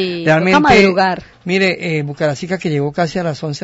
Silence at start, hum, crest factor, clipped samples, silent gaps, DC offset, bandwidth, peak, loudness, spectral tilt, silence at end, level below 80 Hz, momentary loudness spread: 0 s; none; 14 dB; under 0.1%; none; under 0.1%; 8 kHz; 0 dBFS; -14 LUFS; -6 dB/octave; 0 s; -42 dBFS; 11 LU